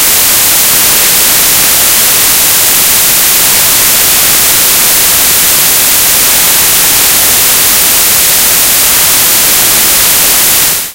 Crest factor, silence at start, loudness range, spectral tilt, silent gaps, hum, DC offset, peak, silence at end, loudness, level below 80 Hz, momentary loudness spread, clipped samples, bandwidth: 6 dB; 0 s; 0 LU; 0.5 dB/octave; none; none; under 0.1%; 0 dBFS; 0 s; -3 LUFS; -34 dBFS; 0 LU; 5%; over 20 kHz